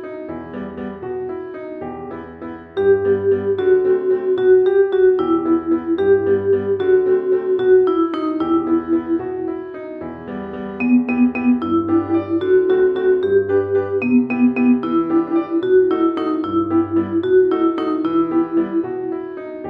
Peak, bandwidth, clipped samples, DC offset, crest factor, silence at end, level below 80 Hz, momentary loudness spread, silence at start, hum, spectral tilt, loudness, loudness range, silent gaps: -4 dBFS; 4.3 kHz; under 0.1%; under 0.1%; 14 dB; 0 s; -54 dBFS; 15 LU; 0 s; none; -9.5 dB/octave; -17 LUFS; 4 LU; none